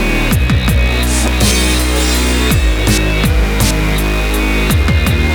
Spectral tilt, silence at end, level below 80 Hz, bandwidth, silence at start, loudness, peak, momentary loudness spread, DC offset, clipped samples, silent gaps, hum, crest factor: -4.5 dB/octave; 0 s; -14 dBFS; over 20 kHz; 0 s; -13 LUFS; 0 dBFS; 3 LU; under 0.1%; under 0.1%; none; none; 12 dB